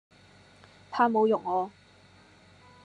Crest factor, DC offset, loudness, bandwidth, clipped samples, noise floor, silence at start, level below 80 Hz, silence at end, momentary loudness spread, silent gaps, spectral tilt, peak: 20 dB; under 0.1%; -27 LUFS; 9.4 kHz; under 0.1%; -57 dBFS; 0.9 s; -72 dBFS; 1.15 s; 14 LU; none; -6.5 dB/octave; -10 dBFS